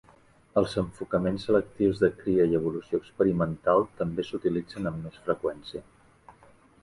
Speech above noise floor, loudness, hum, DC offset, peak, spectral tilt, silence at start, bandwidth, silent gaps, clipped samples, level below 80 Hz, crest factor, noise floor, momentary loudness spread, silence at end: 31 dB; -28 LUFS; none; under 0.1%; -10 dBFS; -8 dB/octave; 0.55 s; 11.5 kHz; none; under 0.1%; -54 dBFS; 18 dB; -58 dBFS; 9 LU; 0.5 s